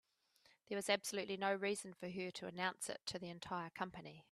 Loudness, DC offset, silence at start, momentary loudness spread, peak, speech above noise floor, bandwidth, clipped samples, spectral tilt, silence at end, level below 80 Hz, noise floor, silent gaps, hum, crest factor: -43 LUFS; under 0.1%; 0.7 s; 9 LU; -20 dBFS; 31 dB; 14 kHz; under 0.1%; -3 dB/octave; 0.1 s; -80 dBFS; -74 dBFS; none; none; 24 dB